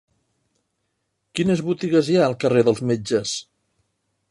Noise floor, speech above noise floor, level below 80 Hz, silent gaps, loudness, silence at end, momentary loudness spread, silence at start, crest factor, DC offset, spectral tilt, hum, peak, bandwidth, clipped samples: -74 dBFS; 55 dB; -60 dBFS; none; -21 LUFS; 0.9 s; 9 LU; 1.35 s; 20 dB; under 0.1%; -5.5 dB/octave; none; -4 dBFS; 11.5 kHz; under 0.1%